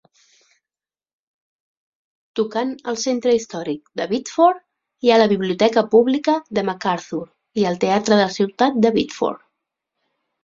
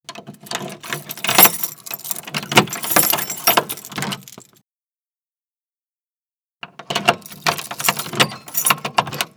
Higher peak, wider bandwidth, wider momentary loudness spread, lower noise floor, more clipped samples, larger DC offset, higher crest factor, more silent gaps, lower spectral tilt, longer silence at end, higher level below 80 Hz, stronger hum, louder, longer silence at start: about the same, -2 dBFS vs 0 dBFS; second, 7.6 kHz vs over 20 kHz; second, 12 LU vs 16 LU; about the same, under -90 dBFS vs under -90 dBFS; neither; neither; about the same, 18 dB vs 22 dB; second, none vs 4.64-6.59 s; first, -5 dB/octave vs -2 dB/octave; first, 1.1 s vs 0.1 s; about the same, -62 dBFS vs -64 dBFS; neither; about the same, -19 LUFS vs -17 LUFS; first, 2.35 s vs 0.1 s